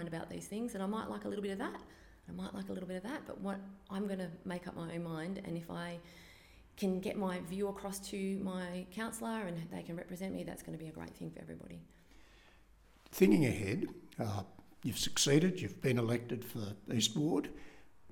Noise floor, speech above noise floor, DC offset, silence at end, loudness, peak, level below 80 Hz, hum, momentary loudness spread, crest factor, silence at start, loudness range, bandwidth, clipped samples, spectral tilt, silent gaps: -64 dBFS; 26 dB; under 0.1%; 0 s; -38 LUFS; -14 dBFS; -64 dBFS; none; 17 LU; 24 dB; 0 s; 9 LU; 17.5 kHz; under 0.1%; -5 dB/octave; none